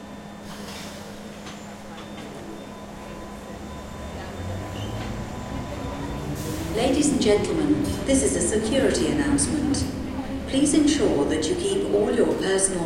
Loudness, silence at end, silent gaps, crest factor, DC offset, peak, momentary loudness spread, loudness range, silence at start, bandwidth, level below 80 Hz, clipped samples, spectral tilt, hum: -24 LUFS; 0 s; none; 18 dB; under 0.1%; -6 dBFS; 17 LU; 15 LU; 0 s; 16.5 kHz; -40 dBFS; under 0.1%; -4.5 dB/octave; none